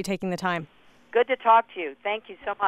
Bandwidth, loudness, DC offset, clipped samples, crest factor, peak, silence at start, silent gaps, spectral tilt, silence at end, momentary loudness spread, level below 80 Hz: 13.5 kHz; -25 LUFS; under 0.1%; under 0.1%; 18 dB; -8 dBFS; 0 s; none; -5 dB/octave; 0 s; 12 LU; -64 dBFS